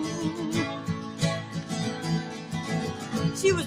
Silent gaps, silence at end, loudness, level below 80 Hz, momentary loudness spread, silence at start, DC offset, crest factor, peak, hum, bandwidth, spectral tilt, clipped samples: none; 0 s; -30 LUFS; -56 dBFS; 6 LU; 0 s; under 0.1%; 18 dB; -10 dBFS; none; 16 kHz; -5 dB/octave; under 0.1%